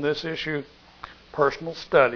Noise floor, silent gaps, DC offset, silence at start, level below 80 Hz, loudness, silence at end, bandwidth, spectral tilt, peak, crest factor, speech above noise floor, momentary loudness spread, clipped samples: -45 dBFS; none; under 0.1%; 0 s; -56 dBFS; -26 LUFS; 0 s; 5.4 kHz; -5.5 dB/octave; -4 dBFS; 22 dB; 21 dB; 21 LU; under 0.1%